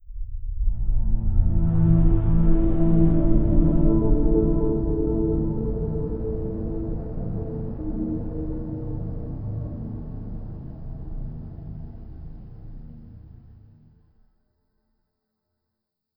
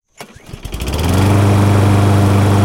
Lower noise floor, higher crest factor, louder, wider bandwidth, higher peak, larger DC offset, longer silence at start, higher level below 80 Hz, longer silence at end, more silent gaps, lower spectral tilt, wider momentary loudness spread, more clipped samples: first, -82 dBFS vs -37 dBFS; first, 18 dB vs 12 dB; second, -25 LUFS vs -12 LUFS; second, 2 kHz vs 16 kHz; second, -6 dBFS vs 0 dBFS; neither; second, 0.05 s vs 0.2 s; about the same, -26 dBFS vs -28 dBFS; first, 2.85 s vs 0 s; neither; first, -15 dB/octave vs -6.5 dB/octave; about the same, 19 LU vs 18 LU; neither